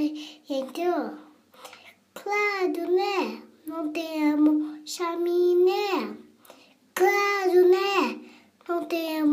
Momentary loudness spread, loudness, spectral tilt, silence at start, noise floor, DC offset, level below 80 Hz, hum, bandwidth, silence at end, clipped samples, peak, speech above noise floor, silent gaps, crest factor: 18 LU; -25 LUFS; -3.5 dB/octave; 0 s; -54 dBFS; under 0.1%; -80 dBFS; none; 15.5 kHz; 0 s; under 0.1%; -8 dBFS; 30 dB; none; 16 dB